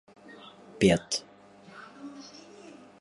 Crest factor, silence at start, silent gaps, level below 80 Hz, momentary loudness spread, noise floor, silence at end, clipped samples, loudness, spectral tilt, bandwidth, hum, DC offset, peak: 24 dB; 0.8 s; none; -58 dBFS; 26 LU; -52 dBFS; 0.8 s; under 0.1%; -27 LUFS; -4.5 dB/octave; 11.5 kHz; 50 Hz at -60 dBFS; under 0.1%; -8 dBFS